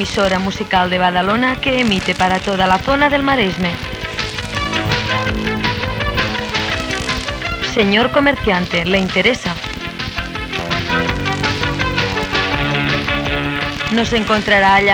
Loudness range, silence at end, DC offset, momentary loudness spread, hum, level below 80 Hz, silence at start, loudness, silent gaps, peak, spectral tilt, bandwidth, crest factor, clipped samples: 3 LU; 0 s; under 0.1%; 8 LU; none; -32 dBFS; 0 s; -16 LUFS; none; 0 dBFS; -4.5 dB/octave; 18.5 kHz; 16 dB; under 0.1%